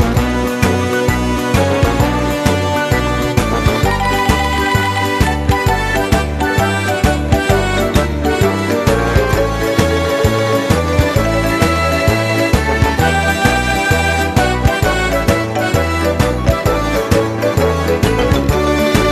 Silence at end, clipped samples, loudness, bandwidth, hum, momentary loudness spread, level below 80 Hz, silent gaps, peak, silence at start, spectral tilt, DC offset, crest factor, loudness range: 0 s; under 0.1%; -14 LUFS; 14 kHz; none; 2 LU; -22 dBFS; none; 0 dBFS; 0 s; -5.5 dB/octave; under 0.1%; 14 dB; 1 LU